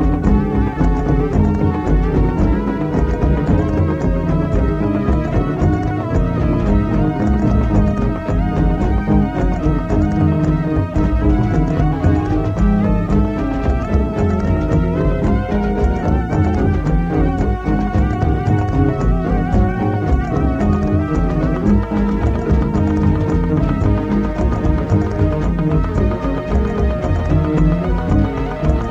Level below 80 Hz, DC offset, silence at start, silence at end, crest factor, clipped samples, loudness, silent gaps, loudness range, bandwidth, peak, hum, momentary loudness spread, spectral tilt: -20 dBFS; under 0.1%; 0 s; 0 s; 14 dB; under 0.1%; -17 LUFS; none; 1 LU; 7.4 kHz; -2 dBFS; none; 3 LU; -9.5 dB/octave